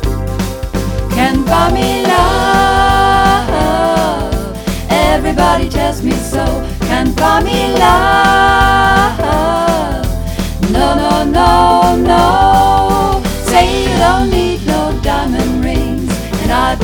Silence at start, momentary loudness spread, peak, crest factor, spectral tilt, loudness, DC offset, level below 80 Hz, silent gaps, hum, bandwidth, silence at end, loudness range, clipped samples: 0 s; 9 LU; 0 dBFS; 12 dB; -5 dB/octave; -12 LUFS; under 0.1%; -20 dBFS; none; none; 19.5 kHz; 0 s; 3 LU; 0.2%